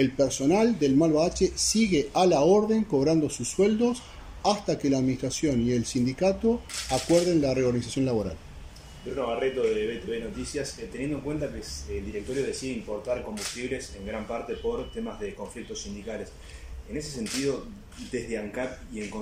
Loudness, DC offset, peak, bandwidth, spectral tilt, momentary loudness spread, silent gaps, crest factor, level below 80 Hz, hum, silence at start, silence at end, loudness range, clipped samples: -27 LUFS; under 0.1%; -10 dBFS; 16 kHz; -5 dB/octave; 14 LU; none; 18 dB; -46 dBFS; none; 0 s; 0 s; 11 LU; under 0.1%